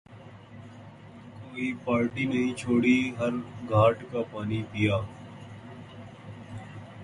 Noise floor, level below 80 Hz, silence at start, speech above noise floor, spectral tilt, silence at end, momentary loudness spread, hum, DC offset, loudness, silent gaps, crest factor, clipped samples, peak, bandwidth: -48 dBFS; -56 dBFS; 0.1 s; 21 dB; -7 dB/octave; 0 s; 24 LU; none; under 0.1%; -27 LUFS; none; 20 dB; under 0.1%; -8 dBFS; 11 kHz